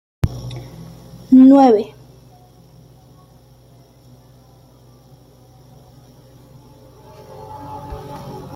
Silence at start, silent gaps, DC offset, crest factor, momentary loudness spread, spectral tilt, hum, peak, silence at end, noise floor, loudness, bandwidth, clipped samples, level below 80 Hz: 0.25 s; none; under 0.1%; 18 dB; 30 LU; -8.5 dB/octave; none; -2 dBFS; 0.15 s; -48 dBFS; -12 LUFS; 6.2 kHz; under 0.1%; -44 dBFS